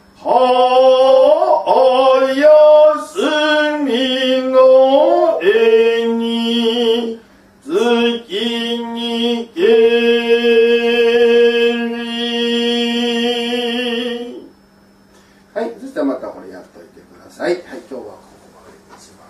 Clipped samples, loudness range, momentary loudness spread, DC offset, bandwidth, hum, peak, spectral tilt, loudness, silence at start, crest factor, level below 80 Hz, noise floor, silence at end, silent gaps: under 0.1%; 14 LU; 14 LU; under 0.1%; 12.5 kHz; none; 0 dBFS; -4 dB/octave; -13 LUFS; 0.2 s; 14 dB; -60 dBFS; -48 dBFS; 1.15 s; none